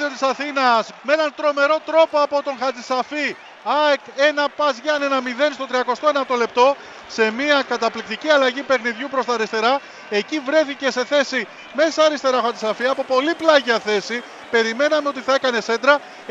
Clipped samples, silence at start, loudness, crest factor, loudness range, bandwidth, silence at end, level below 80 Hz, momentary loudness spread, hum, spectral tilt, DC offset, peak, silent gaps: under 0.1%; 0 s; -19 LUFS; 20 dB; 1 LU; 8 kHz; 0 s; -68 dBFS; 7 LU; none; -2.5 dB/octave; under 0.1%; 0 dBFS; none